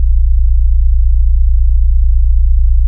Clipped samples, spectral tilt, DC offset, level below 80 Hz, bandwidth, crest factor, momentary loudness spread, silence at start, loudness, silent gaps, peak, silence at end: under 0.1%; -26 dB/octave; under 0.1%; -8 dBFS; 0.2 kHz; 6 dB; 0 LU; 0 s; -14 LUFS; none; 0 dBFS; 0 s